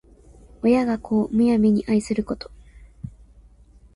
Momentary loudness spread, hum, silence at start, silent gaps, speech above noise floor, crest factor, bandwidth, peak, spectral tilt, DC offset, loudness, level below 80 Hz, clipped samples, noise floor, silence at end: 22 LU; none; 0.65 s; none; 31 dB; 16 dB; 11 kHz; -8 dBFS; -7 dB/octave; under 0.1%; -21 LUFS; -48 dBFS; under 0.1%; -51 dBFS; 0.85 s